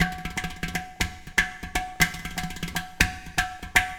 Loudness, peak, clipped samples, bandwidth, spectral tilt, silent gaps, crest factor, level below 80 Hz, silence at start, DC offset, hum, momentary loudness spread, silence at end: -27 LUFS; 0 dBFS; under 0.1%; over 20 kHz; -2.5 dB/octave; none; 28 dB; -38 dBFS; 0 s; under 0.1%; none; 8 LU; 0 s